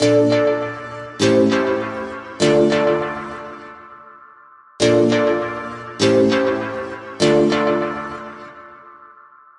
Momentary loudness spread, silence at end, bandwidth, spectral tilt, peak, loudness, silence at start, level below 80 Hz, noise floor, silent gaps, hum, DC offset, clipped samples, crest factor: 18 LU; 0.65 s; 11.5 kHz; -5 dB/octave; -2 dBFS; -18 LUFS; 0 s; -54 dBFS; -46 dBFS; none; none; under 0.1%; under 0.1%; 16 dB